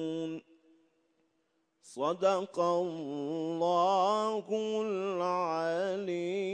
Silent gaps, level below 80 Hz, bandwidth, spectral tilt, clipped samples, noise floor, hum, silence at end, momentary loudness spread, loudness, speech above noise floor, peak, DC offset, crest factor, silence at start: none; -86 dBFS; 10 kHz; -5.5 dB/octave; under 0.1%; -77 dBFS; none; 0 s; 9 LU; -32 LUFS; 46 dB; -16 dBFS; under 0.1%; 18 dB; 0 s